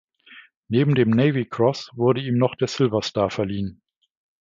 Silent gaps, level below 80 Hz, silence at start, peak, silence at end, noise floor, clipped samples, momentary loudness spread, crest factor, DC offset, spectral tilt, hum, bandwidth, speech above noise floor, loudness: 0.57-0.63 s; -54 dBFS; 0.3 s; -4 dBFS; 0.7 s; -49 dBFS; under 0.1%; 7 LU; 18 dB; under 0.1%; -7 dB/octave; none; 7.6 kHz; 28 dB; -22 LUFS